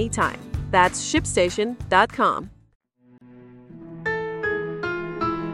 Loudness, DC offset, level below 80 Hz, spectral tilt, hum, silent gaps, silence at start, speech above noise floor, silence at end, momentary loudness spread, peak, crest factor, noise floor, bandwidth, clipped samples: -23 LUFS; under 0.1%; -42 dBFS; -4 dB/octave; none; 2.75-2.80 s; 0 s; 31 dB; 0 s; 12 LU; -2 dBFS; 22 dB; -52 dBFS; 14.5 kHz; under 0.1%